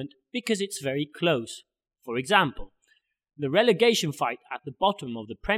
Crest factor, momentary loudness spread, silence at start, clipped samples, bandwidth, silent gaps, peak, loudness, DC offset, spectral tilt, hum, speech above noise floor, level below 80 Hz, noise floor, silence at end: 24 dB; 15 LU; 0 s; under 0.1%; 16 kHz; none; -4 dBFS; -26 LUFS; under 0.1%; -4 dB/octave; none; 42 dB; -52 dBFS; -68 dBFS; 0 s